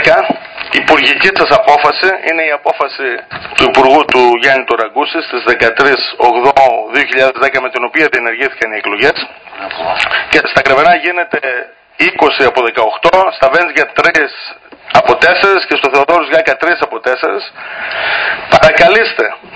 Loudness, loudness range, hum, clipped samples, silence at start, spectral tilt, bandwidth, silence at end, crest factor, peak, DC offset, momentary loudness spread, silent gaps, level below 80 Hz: -10 LUFS; 2 LU; none; 2%; 0 s; -4 dB/octave; 8 kHz; 0 s; 10 dB; 0 dBFS; under 0.1%; 10 LU; none; -44 dBFS